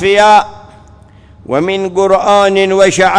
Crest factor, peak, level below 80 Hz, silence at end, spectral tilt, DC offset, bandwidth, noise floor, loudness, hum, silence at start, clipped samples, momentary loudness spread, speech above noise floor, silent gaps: 10 dB; 0 dBFS; -42 dBFS; 0 s; -4 dB/octave; under 0.1%; 10.5 kHz; -39 dBFS; -10 LUFS; none; 0 s; 0.3%; 9 LU; 30 dB; none